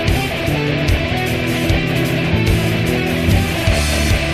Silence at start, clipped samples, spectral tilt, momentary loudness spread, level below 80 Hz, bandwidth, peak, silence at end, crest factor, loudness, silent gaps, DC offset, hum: 0 s; under 0.1%; -5.5 dB/octave; 2 LU; -24 dBFS; 14 kHz; -2 dBFS; 0 s; 14 dB; -16 LUFS; none; 0.5%; none